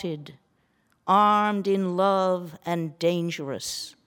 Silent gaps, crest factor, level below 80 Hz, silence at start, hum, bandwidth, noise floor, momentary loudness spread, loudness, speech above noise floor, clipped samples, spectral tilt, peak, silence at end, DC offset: none; 18 dB; -72 dBFS; 0 s; none; 18.5 kHz; -68 dBFS; 12 LU; -24 LUFS; 43 dB; under 0.1%; -5.5 dB/octave; -8 dBFS; 0.15 s; under 0.1%